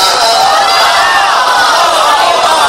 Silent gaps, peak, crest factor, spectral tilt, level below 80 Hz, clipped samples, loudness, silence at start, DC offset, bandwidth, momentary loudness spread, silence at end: none; 0 dBFS; 8 dB; 0 dB/octave; -44 dBFS; under 0.1%; -7 LUFS; 0 s; under 0.1%; 17 kHz; 1 LU; 0 s